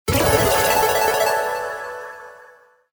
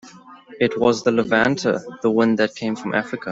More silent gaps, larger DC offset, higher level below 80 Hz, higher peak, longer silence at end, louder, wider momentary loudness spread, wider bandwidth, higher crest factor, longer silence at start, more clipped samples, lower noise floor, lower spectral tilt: neither; neither; first, -38 dBFS vs -60 dBFS; about the same, -4 dBFS vs -4 dBFS; first, 0.6 s vs 0 s; about the same, -18 LUFS vs -20 LUFS; first, 17 LU vs 6 LU; first, over 20 kHz vs 7.8 kHz; about the same, 16 dB vs 18 dB; about the same, 0.05 s vs 0.05 s; neither; first, -50 dBFS vs -43 dBFS; second, -3 dB/octave vs -5.5 dB/octave